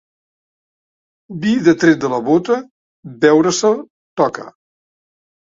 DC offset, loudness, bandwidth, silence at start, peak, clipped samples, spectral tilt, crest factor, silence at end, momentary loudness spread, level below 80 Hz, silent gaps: under 0.1%; -15 LUFS; 7.8 kHz; 1.3 s; 0 dBFS; under 0.1%; -5 dB/octave; 18 dB; 1.1 s; 11 LU; -58 dBFS; 2.71-3.03 s, 3.90-4.17 s